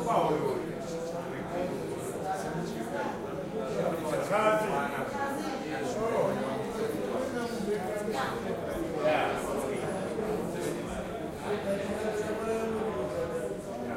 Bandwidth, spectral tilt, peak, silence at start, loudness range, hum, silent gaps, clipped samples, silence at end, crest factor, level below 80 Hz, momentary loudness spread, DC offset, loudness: 16 kHz; -5.5 dB/octave; -14 dBFS; 0 s; 3 LU; none; none; under 0.1%; 0 s; 18 dB; -56 dBFS; 8 LU; under 0.1%; -32 LUFS